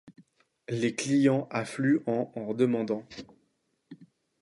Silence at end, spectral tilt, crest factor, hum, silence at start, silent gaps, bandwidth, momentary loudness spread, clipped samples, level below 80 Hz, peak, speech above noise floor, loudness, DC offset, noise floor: 0.4 s; -6 dB/octave; 18 dB; none; 0.05 s; none; 11.5 kHz; 14 LU; under 0.1%; -72 dBFS; -12 dBFS; 47 dB; -28 LUFS; under 0.1%; -74 dBFS